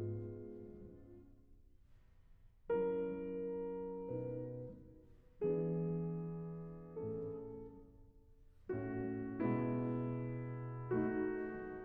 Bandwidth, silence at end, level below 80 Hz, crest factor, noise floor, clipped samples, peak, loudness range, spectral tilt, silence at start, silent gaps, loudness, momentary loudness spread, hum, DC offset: 3.6 kHz; 0 s; -64 dBFS; 18 dB; -64 dBFS; under 0.1%; -26 dBFS; 5 LU; -10 dB/octave; 0 s; none; -42 LUFS; 19 LU; none; under 0.1%